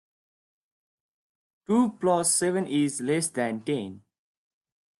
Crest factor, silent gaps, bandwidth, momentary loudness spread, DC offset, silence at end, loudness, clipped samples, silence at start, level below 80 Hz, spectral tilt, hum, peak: 18 dB; none; 12.5 kHz; 9 LU; under 0.1%; 1 s; -26 LUFS; under 0.1%; 1.7 s; -72 dBFS; -4 dB/octave; none; -10 dBFS